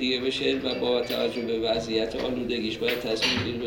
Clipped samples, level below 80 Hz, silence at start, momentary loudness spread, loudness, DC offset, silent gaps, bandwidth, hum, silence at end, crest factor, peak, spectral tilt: under 0.1%; -52 dBFS; 0 s; 4 LU; -26 LUFS; under 0.1%; none; over 20 kHz; none; 0 s; 16 dB; -10 dBFS; -4.5 dB/octave